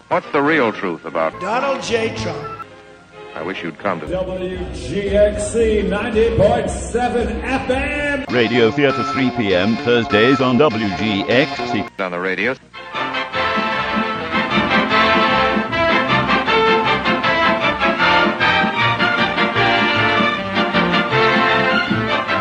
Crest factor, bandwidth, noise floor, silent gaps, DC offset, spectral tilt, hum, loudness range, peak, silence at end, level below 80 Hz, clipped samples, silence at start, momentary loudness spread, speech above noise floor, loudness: 16 dB; 10.5 kHz; -41 dBFS; none; under 0.1%; -5 dB/octave; none; 7 LU; 0 dBFS; 0 s; -38 dBFS; under 0.1%; 0.1 s; 10 LU; 24 dB; -16 LUFS